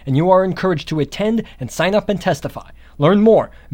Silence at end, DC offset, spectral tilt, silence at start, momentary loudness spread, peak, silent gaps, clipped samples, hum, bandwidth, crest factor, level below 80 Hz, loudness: 0 s; under 0.1%; -6.5 dB/octave; 0.05 s; 11 LU; 0 dBFS; none; under 0.1%; none; 16.5 kHz; 16 dB; -42 dBFS; -16 LUFS